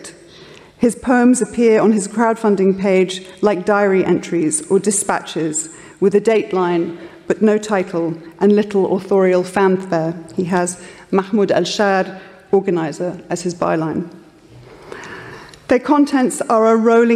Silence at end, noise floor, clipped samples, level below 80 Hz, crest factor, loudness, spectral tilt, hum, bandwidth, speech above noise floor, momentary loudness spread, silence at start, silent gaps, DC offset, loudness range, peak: 0 s; -42 dBFS; under 0.1%; -56 dBFS; 14 dB; -16 LUFS; -5 dB/octave; none; 14 kHz; 27 dB; 12 LU; 0 s; none; under 0.1%; 5 LU; -2 dBFS